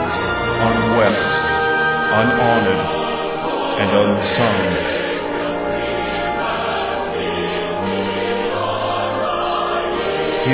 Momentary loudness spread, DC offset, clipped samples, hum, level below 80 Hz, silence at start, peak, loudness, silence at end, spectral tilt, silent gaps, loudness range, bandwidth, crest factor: 6 LU; under 0.1%; under 0.1%; none; -40 dBFS; 0 s; -2 dBFS; -18 LUFS; 0 s; -9.5 dB/octave; none; 4 LU; 4 kHz; 16 dB